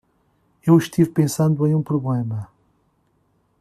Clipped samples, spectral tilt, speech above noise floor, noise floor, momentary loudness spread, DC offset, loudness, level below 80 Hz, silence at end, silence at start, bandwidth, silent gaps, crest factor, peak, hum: under 0.1%; -7.5 dB/octave; 46 dB; -64 dBFS; 12 LU; under 0.1%; -20 LUFS; -58 dBFS; 1.15 s; 0.65 s; 14 kHz; none; 18 dB; -4 dBFS; none